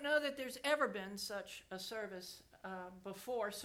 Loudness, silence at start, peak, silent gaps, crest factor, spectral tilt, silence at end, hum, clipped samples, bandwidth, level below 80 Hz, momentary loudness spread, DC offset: -42 LUFS; 0 s; -22 dBFS; none; 20 dB; -3 dB/octave; 0 s; none; under 0.1%; 17.5 kHz; -76 dBFS; 14 LU; under 0.1%